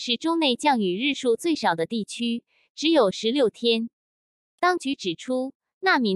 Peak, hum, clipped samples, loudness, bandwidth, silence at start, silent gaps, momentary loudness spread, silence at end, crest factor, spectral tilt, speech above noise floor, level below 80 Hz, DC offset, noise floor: -6 dBFS; none; under 0.1%; -24 LUFS; 12.5 kHz; 0 s; 2.70-2.75 s, 3.93-4.58 s, 5.55-5.60 s, 5.74-5.81 s; 8 LU; 0 s; 18 dB; -4 dB/octave; over 67 dB; -72 dBFS; under 0.1%; under -90 dBFS